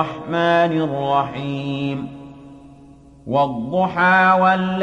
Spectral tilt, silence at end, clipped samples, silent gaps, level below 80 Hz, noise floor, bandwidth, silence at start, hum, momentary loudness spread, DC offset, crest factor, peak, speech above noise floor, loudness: -7 dB/octave; 0 s; under 0.1%; none; -54 dBFS; -45 dBFS; 9.2 kHz; 0 s; none; 12 LU; under 0.1%; 14 dB; -4 dBFS; 27 dB; -18 LUFS